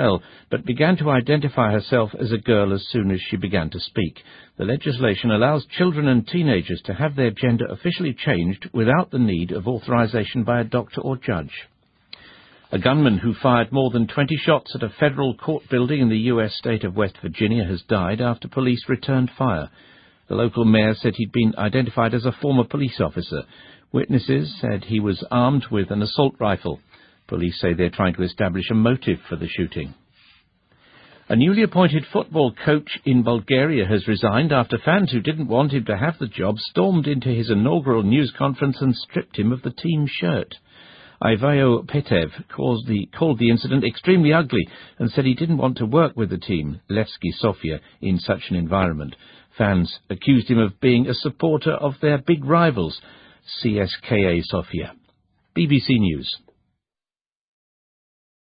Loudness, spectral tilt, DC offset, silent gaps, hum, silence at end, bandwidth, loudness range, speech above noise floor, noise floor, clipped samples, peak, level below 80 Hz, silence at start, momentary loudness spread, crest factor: -21 LUFS; -12 dB/octave; under 0.1%; none; none; 2.1 s; 5.2 kHz; 4 LU; over 70 dB; under -90 dBFS; under 0.1%; 0 dBFS; -48 dBFS; 0 s; 9 LU; 20 dB